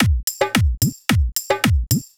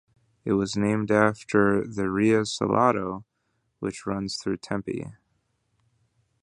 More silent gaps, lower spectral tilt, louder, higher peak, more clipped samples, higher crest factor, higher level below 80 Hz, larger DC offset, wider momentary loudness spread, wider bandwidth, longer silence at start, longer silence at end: first, 0.23-0.27 s vs none; second, -4.5 dB/octave vs -6 dB/octave; first, -19 LUFS vs -25 LUFS; about the same, -4 dBFS vs -4 dBFS; neither; second, 14 dB vs 22 dB; first, -24 dBFS vs -56 dBFS; neither; second, 3 LU vs 12 LU; first, over 20 kHz vs 11 kHz; second, 0 s vs 0.45 s; second, 0.1 s vs 1.3 s